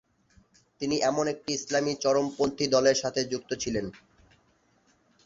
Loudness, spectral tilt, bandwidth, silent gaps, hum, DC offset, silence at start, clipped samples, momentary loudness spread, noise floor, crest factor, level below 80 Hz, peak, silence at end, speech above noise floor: -27 LUFS; -3.5 dB/octave; 7.8 kHz; none; none; under 0.1%; 0.8 s; under 0.1%; 9 LU; -67 dBFS; 20 dB; -60 dBFS; -10 dBFS; 1.3 s; 39 dB